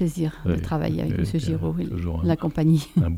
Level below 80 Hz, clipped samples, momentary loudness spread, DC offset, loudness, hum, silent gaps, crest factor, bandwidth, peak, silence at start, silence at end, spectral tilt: -40 dBFS; under 0.1%; 6 LU; under 0.1%; -24 LUFS; none; none; 14 dB; 14.5 kHz; -8 dBFS; 0 s; 0 s; -8 dB/octave